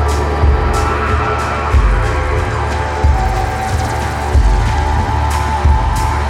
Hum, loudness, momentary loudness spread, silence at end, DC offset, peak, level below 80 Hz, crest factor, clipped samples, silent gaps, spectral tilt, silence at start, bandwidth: none; -15 LUFS; 4 LU; 0 s; under 0.1%; -2 dBFS; -16 dBFS; 12 dB; under 0.1%; none; -6 dB/octave; 0 s; 12.5 kHz